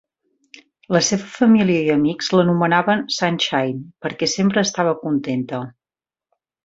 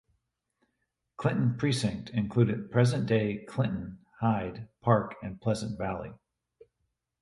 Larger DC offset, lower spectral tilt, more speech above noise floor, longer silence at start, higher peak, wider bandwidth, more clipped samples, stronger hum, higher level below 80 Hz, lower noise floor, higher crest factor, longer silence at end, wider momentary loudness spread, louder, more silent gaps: neither; second, -4.5 dB/octave vs -7 dB/octave; first, over 72 dB vs 52 dB; second, 0.9 s vs 1.2 s; first, -2 dBFS vs -8 dBFS; second, 7.8 kHz vs 11.5 kHz; neither; neither; about the same, -60 dBFS vs -56 dBFS; first, under -90 dBFS vs -81 dBFS; about the same, 18 dB vs 22 dB; about the same, 0.95 s vs 1.05 s; about the same, 10 LU vs 11 LU; first, -18 LUFS vs -30 LUFS; neither